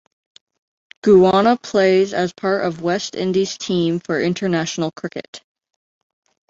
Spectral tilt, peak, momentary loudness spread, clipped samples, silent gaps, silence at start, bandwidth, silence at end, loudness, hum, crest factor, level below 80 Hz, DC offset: -5.5 dB/octave; -2 dBFS; 11 LU; under 0.1%; 5.28-5.33 s; 1.05 s; 7.8 kHz; 1.1 s; -18 LUFS; none; 16 dB; -58 dBFS; under 0.1%